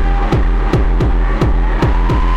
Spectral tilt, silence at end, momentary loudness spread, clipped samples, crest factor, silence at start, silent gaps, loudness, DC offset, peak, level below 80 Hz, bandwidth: -8 dB/octave; 0 s; 1 LU; under 0.1%; 8 dB; 0 s; none; -16 LUFS; under 0.1%; -4 dBFS; -12 dBFS; 6.4 kHz